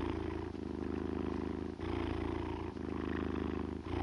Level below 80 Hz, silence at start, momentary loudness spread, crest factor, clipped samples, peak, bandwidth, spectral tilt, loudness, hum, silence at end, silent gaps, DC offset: -50 dBFS; 0 s; 3 LU; 14 dB; under 0.1%; -24 dBFS; 10.5 kHz; -8 dB/octave; -40 LUFS; none; 0 s; none; under 0.1%